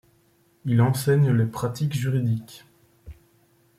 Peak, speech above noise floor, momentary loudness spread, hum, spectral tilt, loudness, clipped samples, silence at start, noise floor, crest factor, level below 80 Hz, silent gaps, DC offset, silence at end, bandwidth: -8 dBFS; 40 dB; 10 LU; none; -7 dB/octave; -23 LUFS; under 0.1%; 0.65 s; -62 dBFS; 16 dB; -56 dBFS; none; under 0.1%; 0.65 s; 15.5 kHz